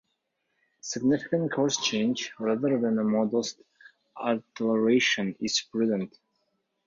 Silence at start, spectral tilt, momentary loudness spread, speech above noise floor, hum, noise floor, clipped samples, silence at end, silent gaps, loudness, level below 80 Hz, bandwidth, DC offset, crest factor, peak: 0.85 s; -4 dB/octave; 9 LU; 52 dB; none; -78 dBFS; under 0.1%; 0.8 s; none; -27 LUFS; -70 dBFS; 7.6 kHz; under 0.1%; 16 dB; -12 dBFS